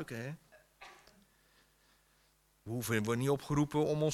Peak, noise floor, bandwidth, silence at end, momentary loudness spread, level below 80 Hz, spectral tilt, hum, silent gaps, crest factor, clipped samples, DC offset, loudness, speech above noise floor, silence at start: -20 dBFS; -71 dBFS; 16 kHz; 0 s; 23 LU; -64 dBFS; -6 dB/octave; none; none; 18 dB; under 0.1%; under 0.1%; -35 LUFS; 37 dB; 0 s